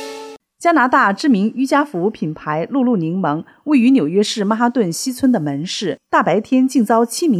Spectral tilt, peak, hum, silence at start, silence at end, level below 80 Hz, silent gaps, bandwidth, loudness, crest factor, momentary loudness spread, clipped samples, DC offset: -5 dB/octave; -2 dBFS; none; 0 s; 0 s; -64 dBFS; none; 14 kHz; -16 LUFS; 14 dB; 9 LU; under 0.1%; under 0.1%